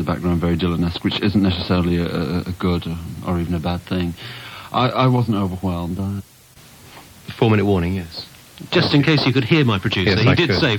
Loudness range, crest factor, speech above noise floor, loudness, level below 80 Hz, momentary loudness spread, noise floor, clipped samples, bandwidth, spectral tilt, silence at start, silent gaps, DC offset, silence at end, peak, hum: 5 LU; 16 dB; 27 dB; -19 LUFS; -40 dBFS; 14 LU; -46 dBFS; under 0.1%; 18 kHz; -7 dB/octave; 0 s; none; under 0.1%; 0 s; -4 dBFS; none